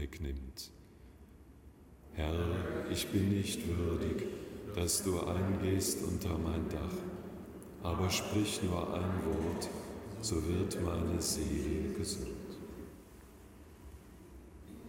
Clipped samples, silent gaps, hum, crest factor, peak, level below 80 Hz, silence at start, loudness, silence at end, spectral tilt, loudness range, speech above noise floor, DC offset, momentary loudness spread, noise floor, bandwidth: under 0.1%; none; none; 18 dB; -18 dBFS; -48 dBFS; 0 s; -36 LUFS; 0 s; -5 dB/octave; 4 LU; 22 dB; under 0.1%; 21 LU; -57 dBFS; 16.5 kHz